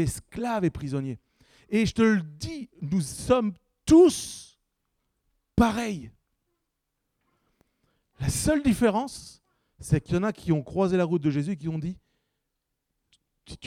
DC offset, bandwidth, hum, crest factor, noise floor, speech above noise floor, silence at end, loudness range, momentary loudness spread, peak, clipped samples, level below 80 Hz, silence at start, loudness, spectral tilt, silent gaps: under 0.1%; 16 kHz; none; 20 dB; -81 dBFS; 56 dB; 0 s; 8 LU; 15 LU; -8 dBFS; under 0.1%; -48 dBFS; 0 s; -25 LUFS; -6 dB/octave; none